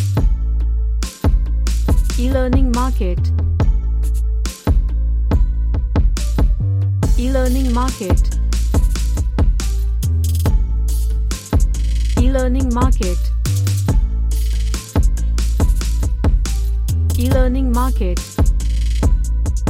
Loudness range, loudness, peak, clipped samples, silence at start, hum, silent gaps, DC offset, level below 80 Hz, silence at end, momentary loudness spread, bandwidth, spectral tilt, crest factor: 1 LU; -18 LUFS; -2 dBFS; under 0.1%; 0 s; none; none; under 0.1%; -16 dBFS; 0 s; 4 LU; 15 kHz; -6.5 dB/octave; 12 dB